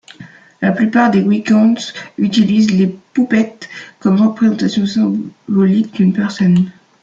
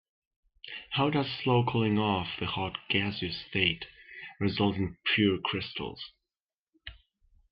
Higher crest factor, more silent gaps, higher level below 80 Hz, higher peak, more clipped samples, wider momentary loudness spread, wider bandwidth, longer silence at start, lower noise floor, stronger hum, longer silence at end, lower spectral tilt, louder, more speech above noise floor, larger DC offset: second, 12 dB vs 20 dB; second, none vs 6.42-6.48 s, 6.58-6.66 s; about the same, -56 dBFS vs -60 dBFS; first, -2 dBFS vs -10 dBFS; neither; second, 8 LU vs 19 LU; first, 7.6 kHz vs 5.6 kHz; second, 0.2 s vs 0.65 s; second, -38 dBFS vs under -90 dBFS; neither; second, 0.3 s vs 0.6 s; second, -7 dB/octave vs -9 dB/octave; first, -14 LUFS vs -29 LUFS; second, 25 dB vs over 61 dB; neither